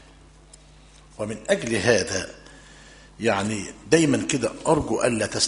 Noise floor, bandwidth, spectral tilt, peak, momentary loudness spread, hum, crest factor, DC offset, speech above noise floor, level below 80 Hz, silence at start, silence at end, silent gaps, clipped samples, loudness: -50 dBFS; 11 kHz; -4 dB/octave; -2 dBFS; 12 LU; none; 22 dB; under 0.1%; 27 dB; -50 dBFS; 1.2 s; 0 s; none; under 0.1%; -23 LUFS